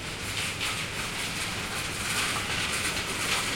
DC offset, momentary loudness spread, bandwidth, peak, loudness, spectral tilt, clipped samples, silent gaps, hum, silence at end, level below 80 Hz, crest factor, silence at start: under 0.1%; 4 LU; 16.5 kHz; -14 dBFS; -29 LUFS; -1.5 dB/octave; under 0.1%; none; none; 0 s; -48 dBFS; 16 dB; 0 s